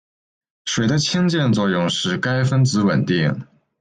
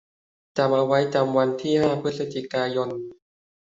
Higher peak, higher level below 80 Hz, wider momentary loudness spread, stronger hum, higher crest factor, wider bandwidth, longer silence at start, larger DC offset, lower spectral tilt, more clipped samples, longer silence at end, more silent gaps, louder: about the same, -6 dBFS vs -6 dBFS; first, -54 dBFS vs -64 dBFS; second, 6 LU vs 10 LU; neither; second, 12 dB vs 18 dB; first, 9.6 kHz vs 7.8 kHz; about the same, 0.65 s vs 0.55 s; neither; second, -5 dB/octave vs -6.5 dB/octave; neither; second, 0.35 s vs 0.5 s; neither; first, -19 LUFS vs -23 LUFS